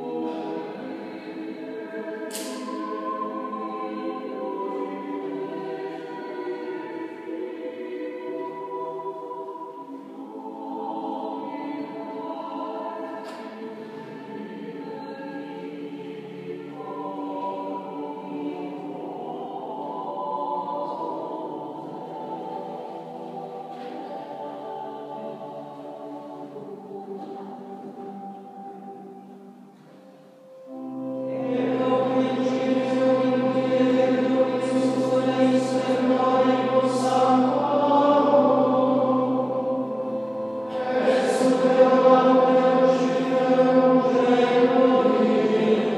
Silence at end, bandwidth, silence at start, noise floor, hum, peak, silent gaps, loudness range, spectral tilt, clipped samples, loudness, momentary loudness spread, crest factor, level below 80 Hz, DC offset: 0 s; 12.5 kHz; 0 s; -49 dBFS; none; -4 dBFS; none; 17 LU; -6 dB/octave; under 0.1%; -24 LUFS; 19 LU; 20 dB; -80 dBFS; under 0.1%